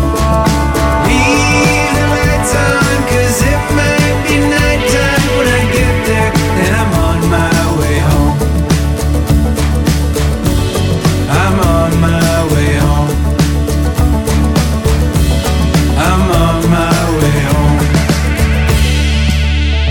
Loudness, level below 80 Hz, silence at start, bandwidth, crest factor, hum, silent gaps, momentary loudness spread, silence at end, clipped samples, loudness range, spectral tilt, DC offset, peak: -11 LUFS; -16 dBFS; 0 s; 18 kHz; 10 dB; none; none; 2 LU; 0 s; under 0.1%; 2 LU; -5.5 dB/octave; under 0.1%; 0 dBFS